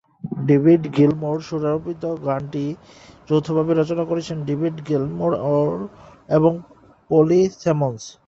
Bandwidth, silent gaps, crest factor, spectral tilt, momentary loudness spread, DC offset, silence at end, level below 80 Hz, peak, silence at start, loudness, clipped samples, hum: 7.8 kHz; none; 18 dB; -8 dB/octave; 11 LU; under 0.1%; 0.15 s; -56 dBFS; -4 dBFS; 0.25 s; -20 LUFS; under 0.1%; none